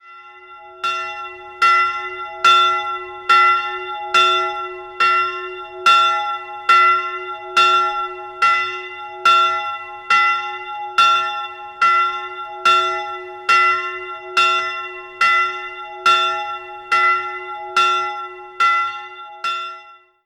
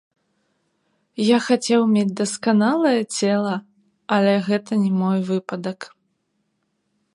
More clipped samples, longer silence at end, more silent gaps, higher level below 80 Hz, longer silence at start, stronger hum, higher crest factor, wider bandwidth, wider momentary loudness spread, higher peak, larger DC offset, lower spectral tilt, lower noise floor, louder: neither; second, 0.3 s vs 1.3 s; neither; first, -62 dBFS vs -72 dBFS; second, 0.05 s vs 1.2 s; neither; about the same, 18 dB vs 18 dB; about the same, 12 kHz vs 11.5 kHz; first, 15 LU vs 12 LU; first, 0 dBFS vs -4 dBFS; neither; second, -0.5 dB/octave vs -5.5 dB/octave; second, -43 dBFS vs -71 dBFS; first, -16 LUFS vs -20 LUFS